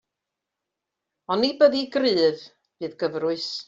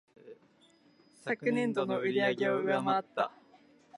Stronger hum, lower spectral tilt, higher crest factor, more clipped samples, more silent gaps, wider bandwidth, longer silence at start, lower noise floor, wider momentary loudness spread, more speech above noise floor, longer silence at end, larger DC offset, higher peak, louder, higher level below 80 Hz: neither; about the same, -5 dB/octave vs -6 dB/octave; about the same, 20 dB vs 18 dB; neither; neither; second, 7.8 kHz vs 11.5 kHz; first, 1.3 s vs 0.25 s; first, -85 dBFS vs -64 dBFS; first, 16 LU vs 7 LU; first, 62 dB vs 34 dB; second, 0.05 s vs 0.7 s; neither; first, -6 dBFS vs -14 dBFS; first, -22 LUFS vs -31 LUFS; first, -70 dBFS vs -84 dBFS